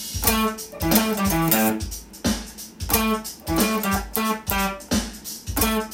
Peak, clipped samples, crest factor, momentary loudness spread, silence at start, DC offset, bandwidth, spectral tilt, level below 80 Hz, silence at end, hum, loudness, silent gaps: 0 dBFS; under 0.1%; 24 dB; 10 LU; 0 s; under 0.1%; 17 kHz; -3.5 dB/octave; -36 dBFS; 0 s; none; -22 LUFS; none